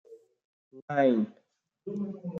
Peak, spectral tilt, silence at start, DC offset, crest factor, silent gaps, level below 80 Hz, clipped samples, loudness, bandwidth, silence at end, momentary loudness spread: -12 dBFS; -8.5 dB/octave; 0.1 s; under 0.1%; 18 dB; 0.45-0.71 s, 0.82-0.88 s; -80 dBFS; under 0.1%; -29 LUFS; 6.6 kHz; 0 s; 14 LU